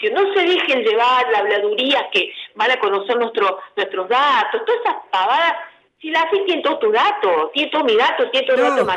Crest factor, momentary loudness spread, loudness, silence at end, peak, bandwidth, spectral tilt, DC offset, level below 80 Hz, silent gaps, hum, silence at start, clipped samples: 14 dB; 5 LU; -17 LUFS; 0 s; -4 dBFS; 9.8 kHz; -3 dB/octave; under 0.1%; -72 dBFS; none; none; 0 s; under 0.1%